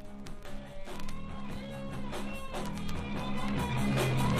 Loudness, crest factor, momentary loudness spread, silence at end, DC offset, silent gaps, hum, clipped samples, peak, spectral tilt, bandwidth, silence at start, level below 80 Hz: -36 LUFS; 16 dB; 16 LU; 0 s; under 0.1%; none; none; under 0.1%; -18 dBFS; -6 dB/octave; 15.5 kHz; 0 s; -44 dBFS